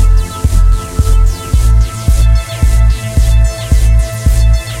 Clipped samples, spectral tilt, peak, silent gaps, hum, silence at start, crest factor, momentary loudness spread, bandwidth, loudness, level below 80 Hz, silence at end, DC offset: under 0.1%; -5.5 dB/octave; 0 dBFS; none; none; 0 s; 8 dB; 3 LU; 14.5 kHz; -12 LUFS; -10 dBFS; 0 s; 0.6%